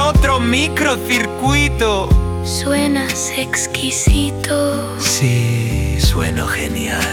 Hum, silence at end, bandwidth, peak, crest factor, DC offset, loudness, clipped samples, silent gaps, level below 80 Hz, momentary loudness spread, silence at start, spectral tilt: none; 0 s; 18 kHz; -2 dBFS; 14 dB; under 0.1%; -16 LUFS; under 0.1%; none; -22 dBFS; 5 LU; 0 s; -4 dB/octave